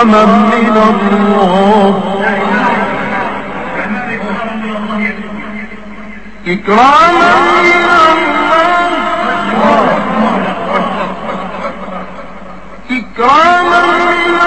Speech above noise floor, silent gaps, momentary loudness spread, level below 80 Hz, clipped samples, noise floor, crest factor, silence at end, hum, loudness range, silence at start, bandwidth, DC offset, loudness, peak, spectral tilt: 23 dB; none; 17 LU; -40 dBFS; 0.3%; -30 dBFS; 10 dB; 0 s; none; 9 LU; 0 s; 8.6 kHz; 3%; -10 LUFS; 0 dBFS; -5.5 dB/octave